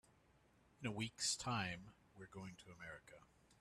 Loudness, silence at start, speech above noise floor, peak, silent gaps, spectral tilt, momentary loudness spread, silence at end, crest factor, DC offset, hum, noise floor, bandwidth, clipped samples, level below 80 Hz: -45 LUFS; 0.8 s; 26 dB; -28 dBFS; none; -3 dB/octave; 22 LU; 0.05 s; 22 dB; under 0.1%; none; -73 dBFS; 13 kHz; under 0.1%; -74 dBFS